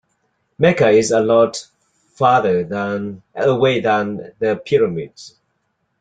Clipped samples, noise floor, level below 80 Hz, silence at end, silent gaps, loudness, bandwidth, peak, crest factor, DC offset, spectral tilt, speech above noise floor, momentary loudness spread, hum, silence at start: under 0.1%; -69 dBFS; -56 dBFS; 0.75 s; none; -17 LUFS; 9.4 kHz; -2 dBFS; 16 dB; under 0.1%; -5.5 dB/octave; 53 dB; 12 LU; none; 0.6 s